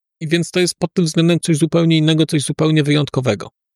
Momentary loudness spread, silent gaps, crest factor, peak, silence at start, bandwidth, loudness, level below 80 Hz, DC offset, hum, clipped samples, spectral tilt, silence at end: 6 LU; none; 12 dB; -4 dBFS; 0.2 s; 13 kHz; -16 LUFS; -56 dBFS; under 0.1%; none; under 0.1%; -5.5 dB/octave; 0.25 s